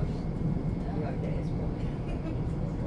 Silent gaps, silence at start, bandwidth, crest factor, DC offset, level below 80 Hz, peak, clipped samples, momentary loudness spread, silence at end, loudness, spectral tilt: none; 0 s; 9.6 kHz; 12 dB; under 0.1%; -38 dBFS; -18 dBFS; under 0.1%; 3 LU; 0 s; -33 LUFS; -9.5 dB/octave